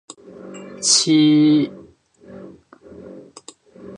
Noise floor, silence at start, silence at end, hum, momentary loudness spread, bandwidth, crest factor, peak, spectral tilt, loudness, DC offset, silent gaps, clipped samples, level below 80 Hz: -47 dBFS; 0.4 s; 0 s; none; 26 LU; 11 kHz; 18 dB; -2 dBFS; -3.5 dB/octave; -15 LUFS; under 0.1%; none; under 0.1%; -64 dBFS